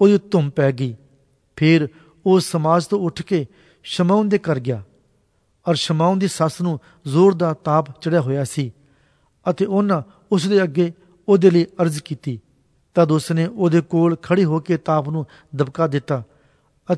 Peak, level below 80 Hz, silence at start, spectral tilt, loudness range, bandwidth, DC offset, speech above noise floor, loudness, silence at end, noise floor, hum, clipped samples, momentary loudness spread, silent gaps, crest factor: -2 dBFS; -60 dBFS; 0 s; -7 dB/octave; 2 LU; 11 kHz; under 0.1%; 45 dB; -19 LUFS; 0 s; -63 dBFS; none; under 0.1%; 12 LU; none; 18 dB